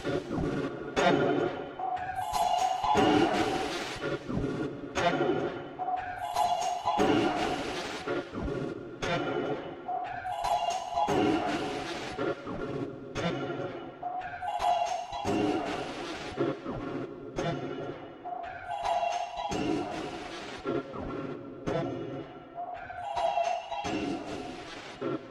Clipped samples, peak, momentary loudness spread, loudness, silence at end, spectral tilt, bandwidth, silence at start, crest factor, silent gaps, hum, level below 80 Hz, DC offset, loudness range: under 0.1%; -12 dBFS; 12 LU; -32 LUFS; 0 s; -5 dB/octave; 15 kHz; 0 s; 20 dB; none; none; -54 dBFS; under 0.1%; 6 LU